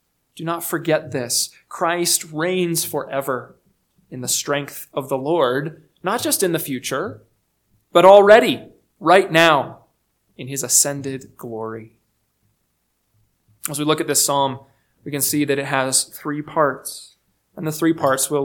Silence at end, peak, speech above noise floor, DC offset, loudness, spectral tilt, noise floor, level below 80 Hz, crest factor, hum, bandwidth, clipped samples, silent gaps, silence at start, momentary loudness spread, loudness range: 0 s; 0 dBFS; 51 dB; under 0.1%; -18 LUFS; -3 dB/octave; -69 dBFS; -64 dBFS; 20 dB; none; 19 kHz; under 0.1%; none; 0.35 s; 17 LU; 8 LU